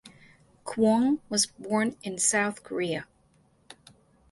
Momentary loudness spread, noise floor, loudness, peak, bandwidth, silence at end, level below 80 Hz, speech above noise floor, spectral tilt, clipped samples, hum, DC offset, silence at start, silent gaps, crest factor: 10 LU; -64 dBFS; -27 LUFS; -10 dBFS; 11.5 kHz; 0.6 s; -68 dBFS; 37 dB; -3 dB/octave; under 0.1%; none; under 0.1%; 0.05 s; none; 20 dB